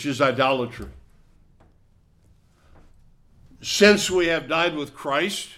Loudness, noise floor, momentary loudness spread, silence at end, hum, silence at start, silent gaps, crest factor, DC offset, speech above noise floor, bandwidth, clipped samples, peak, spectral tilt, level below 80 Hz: -21 LUFS; -58 dBFS; 17 LU; 0.05 s; none; 0 s; none; 22 dB; under 0.1%; 36 dB; 16 kHz; under 0.1%; -2 dBFS; -3.5 dB/octave; -52 dBFS